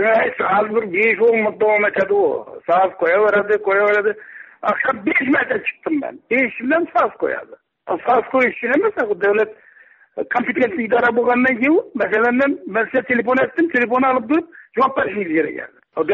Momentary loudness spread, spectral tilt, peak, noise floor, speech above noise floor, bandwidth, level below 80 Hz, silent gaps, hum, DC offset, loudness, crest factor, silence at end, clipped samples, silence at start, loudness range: 8 LU; -3.5 dB/octave; -6 dBFS; -49 dBFS; 32 dB; 7 kHz; -62 dBFS; none; none; under 0.1%; -17 LUFS; 12 dB; 0 s; under 0.1%; 0 s; 3 LU